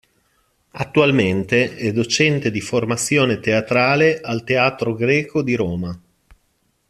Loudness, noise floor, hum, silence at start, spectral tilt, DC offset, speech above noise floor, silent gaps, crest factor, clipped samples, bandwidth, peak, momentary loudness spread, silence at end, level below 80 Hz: -18 LUFS; -65 dBFS; none; 0.75 s; -5 dB/octave; under 0.1%; 47 dB; none; 18 dB; under 0.1%; 13.5 kHz; 0 dBFS; 7 LU; 0.9 s; -54 dBFS